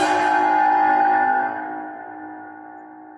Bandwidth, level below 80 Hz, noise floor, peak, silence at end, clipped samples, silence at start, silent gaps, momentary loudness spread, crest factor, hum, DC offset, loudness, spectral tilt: 11 kHz; -68 dBFS; -40 dBFS; -6 dBFS; 0 s; under 0.1%; 0 s; none; 22 LU; 14 dB; none; under 0.1%; -18 LUFS; -3.5 dB/octave